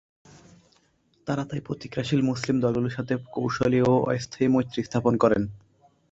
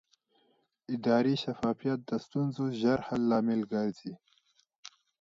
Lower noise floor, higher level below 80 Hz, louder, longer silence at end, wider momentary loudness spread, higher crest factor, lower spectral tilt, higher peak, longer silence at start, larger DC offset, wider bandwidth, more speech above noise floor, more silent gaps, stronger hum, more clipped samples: second, -65 dBFS vs -72 dBFS; first, -54 dBFS vs -68 dBFS; first, -25 LUFS vs -31 LUFS; first, 0.55 s vs 0.3 s; second, 10 LU vs 20 LU; about the same, 20 dB vs 18 dB; about the same, -7 dB/octave vs -7 dB/octave; first, -6 dBFS vs -14 dBFS; first, 1.25 s vs 0.9 s; neither; about the same, 8 kHz vs 7.6 kHz; about the same, 41 dB vs 42 dB; second, none vs 4.78-4.83 s; neither; neither